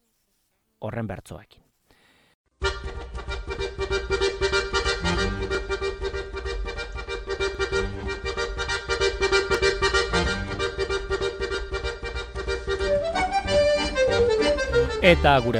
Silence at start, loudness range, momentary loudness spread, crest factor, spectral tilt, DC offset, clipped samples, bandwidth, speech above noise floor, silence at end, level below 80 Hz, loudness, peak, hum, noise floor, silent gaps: 0.8 s; 8 LU; 12 LU; 22 dB; -4.5 dB/octave; under 0.1%; under 0.1%; 12 kHz; 49 dB; 0 s; -34 dBFS; -25 LUFS; -2 dBFS; none; -71 dBFS; 2.34-2.44 s